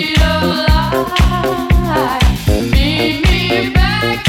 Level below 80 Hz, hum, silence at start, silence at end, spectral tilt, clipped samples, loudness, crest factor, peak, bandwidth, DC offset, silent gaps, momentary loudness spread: -18 dBFS; none; 0 s; 0 s; -5.5 dB/octave; under 0.1%; -13 LUFS; 12 dB; 0 dBFS; 16.5 kHz; under 0.1%; none; 2 LU